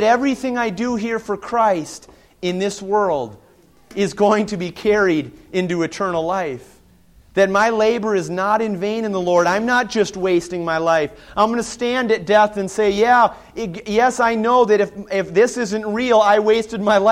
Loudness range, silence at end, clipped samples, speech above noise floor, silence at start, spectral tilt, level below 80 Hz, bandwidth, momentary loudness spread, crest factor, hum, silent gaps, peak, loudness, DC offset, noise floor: 4 LU; 0 s; under 0.1%; 33 dB; 0 s; -5 dB/octave; -52 dBFS; 14 kHz; 10 LU; 16 dB; none; none; -2 dBFS; -18 LUFS; under 0.1%; -50 dBFS